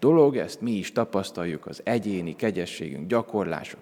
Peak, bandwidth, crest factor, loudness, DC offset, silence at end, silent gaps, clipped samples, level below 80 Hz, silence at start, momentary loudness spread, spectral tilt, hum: -6 dBFS; 16 kHz; 18 dB; -27 LUFS; under 0.1%; 0 s; none; under 0.1%; -68 dBFS; 0 s; 11 LU; -6.5 dB/octave; none